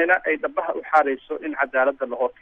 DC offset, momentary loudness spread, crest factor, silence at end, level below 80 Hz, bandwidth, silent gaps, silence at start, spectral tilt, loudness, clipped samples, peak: under 0.1%; 7 LU; 18 dB; 0.1 s; -64 dBFS; 7.8 kHz; none; 0 s; -5 dB/octave; -22 LUFS; under 0.1%; -6 dBFS